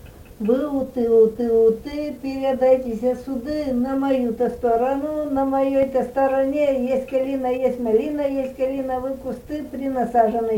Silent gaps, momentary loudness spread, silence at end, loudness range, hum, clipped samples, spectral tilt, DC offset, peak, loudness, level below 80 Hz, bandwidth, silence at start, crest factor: none; 9 LU; 0 s; 3 LU; none; under 0.1%; -7 dB/octave; under 0.1%; -6 dBFS; -21 LUFS; -48 dBFS; 17 kHz; 0 s; 16 dB